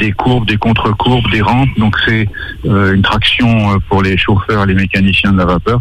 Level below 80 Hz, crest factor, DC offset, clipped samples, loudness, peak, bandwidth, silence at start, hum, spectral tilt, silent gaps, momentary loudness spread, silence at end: -26 dBFS; 10 dB; under 0.1%; under 0.1%; -11 LUFS; 0 dBFS; 10 kHz; 0 s; none; -7 dB/octave; none; 3 LU; 0 s